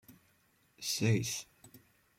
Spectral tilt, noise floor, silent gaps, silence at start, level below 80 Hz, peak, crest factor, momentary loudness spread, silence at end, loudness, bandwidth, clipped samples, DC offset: -4 dB/octave; -71 dBFS; none; 0.1 s; -70 dBFS; -18 dBFS; 20 dB; 12 LU; 0.4 s; -34 LUFS; 16.5 kHz; under 0.1%; under 0.1%